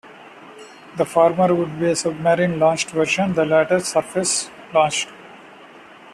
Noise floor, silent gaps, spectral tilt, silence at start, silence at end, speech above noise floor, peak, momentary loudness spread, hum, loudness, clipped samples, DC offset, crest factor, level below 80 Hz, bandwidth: -43 dBFS; none; -4 dB/octave; 0.05 s; 0.05 s; 25 dB; -4 dBFS; 6 LU; none; -19 LUFS; under 0.1%; under 0.1%; 18 dB; -60 dBFS; 13.5 kHz